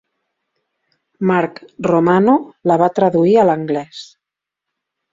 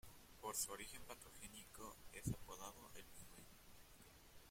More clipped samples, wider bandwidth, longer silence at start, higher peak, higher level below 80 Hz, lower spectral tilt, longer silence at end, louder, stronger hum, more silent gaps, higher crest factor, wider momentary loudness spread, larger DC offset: neither; second, 7.6 kHz vs 16.5 kHz; first, 1.2 s vs 0.05 s; first, 0 dBFS vs -30 dBFS; first, -58 dBFS vs -66 dBFS; first, -8 dB/octave vs -3 dB/octave; first, 1.1 s vs 0 s; first, -15 LUFS vs -52 LUFS; neither; neither; second, 16 dB vs 24 dB; second, 11 LU vs 19 LU; neither